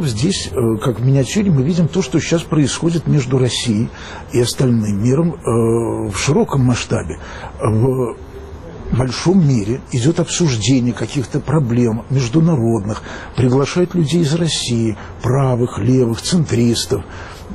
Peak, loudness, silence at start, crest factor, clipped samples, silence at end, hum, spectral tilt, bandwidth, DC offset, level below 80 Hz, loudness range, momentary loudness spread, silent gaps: -4 dBFS; -16 LUFS; 0 s; 12 dB; under 0.1%; 0 s; none; -6 dB/octave; 13 kHz; under 0.1%; -38 dBFS; 2 LU; 8 LU; none